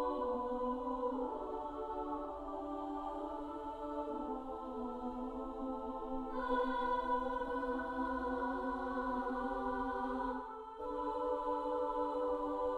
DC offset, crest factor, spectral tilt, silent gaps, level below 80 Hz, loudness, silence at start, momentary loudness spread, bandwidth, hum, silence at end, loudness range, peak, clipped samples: under 0.1%; 14 dB; -6.5 dB/octave; none; -56 dBFS; -40 LUFS; 0 s; 7 LU; 10 kHz; none; 0 s; 5 LU; -24 dBFS; under 0.1%